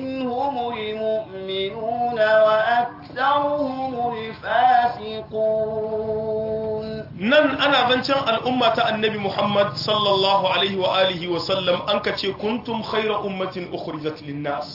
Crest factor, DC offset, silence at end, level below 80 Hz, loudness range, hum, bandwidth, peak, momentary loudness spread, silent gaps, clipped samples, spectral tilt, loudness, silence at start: 16 dB; under 0.1%; 0 s; -56 dBFS; 3 LU; none; 5.8 kHz; -6 dBFS; 11 LU; none; under 0.1%; -5.5 dB/octave; -21 LUFS; 0 s